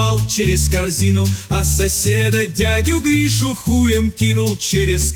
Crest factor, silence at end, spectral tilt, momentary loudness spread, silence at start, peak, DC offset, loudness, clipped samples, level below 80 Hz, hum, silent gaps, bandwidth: 10 dB; 0 s; -4.5 dB/octave; 2 LU; 0 s; -4 dBFS; under 0.1%; -16 LUFS; under 0.1%; -26 dBFS; none; none; 19.5 kHz